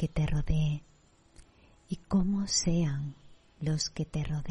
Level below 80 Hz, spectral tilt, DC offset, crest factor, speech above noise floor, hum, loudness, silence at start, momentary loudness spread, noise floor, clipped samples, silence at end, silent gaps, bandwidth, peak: -40 dBFS; -5 dB/octave; under 0.1%; 16 dB; 30 dB; none; -31 LUFS; 0 s; 12 LU; -59 dBFS; under 0.1%; 0 s; none; 10.5 kHz; -14 dBFS